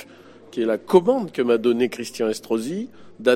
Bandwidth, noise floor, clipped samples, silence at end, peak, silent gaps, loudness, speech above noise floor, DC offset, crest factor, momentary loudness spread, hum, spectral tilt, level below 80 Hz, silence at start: 15.5 kHz; -46 dBFS; under 0.1%; 0 s; -2 dBFS; none; -22 LUFS; 25 dB; under 0.1%; 18 dB; 12 LU; none; -5.5 dB/octave; -68 dBFS; 0 s